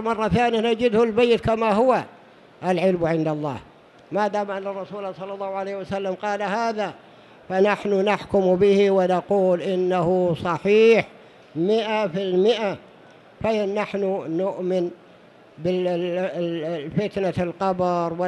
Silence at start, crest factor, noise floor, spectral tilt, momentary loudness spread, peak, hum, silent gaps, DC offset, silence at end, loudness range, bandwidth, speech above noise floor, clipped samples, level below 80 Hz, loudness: 0 s; 16 dB; -50 dBFS; -7 dB/octave; 11 LU; -6 dBFS; none; none; under 0.1%; 0 s; 7 LU; 11 kHz; 28 dB; under 0.1%; -54 dBFS; -22 LUFS